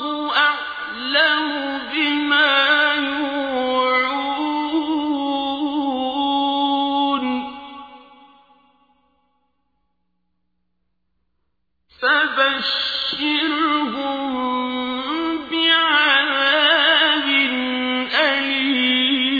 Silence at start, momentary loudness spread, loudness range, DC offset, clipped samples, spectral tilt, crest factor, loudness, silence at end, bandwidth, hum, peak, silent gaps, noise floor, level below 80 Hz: 0 s; 10 LU; 8 LU; under 0.1%; under 0.1%; -3.5 dB/octave; 16 dB; -18 LUFS; 0 s; 5 kHz; none; -4 dBFS; none; -74 dBFS; -60 dBFS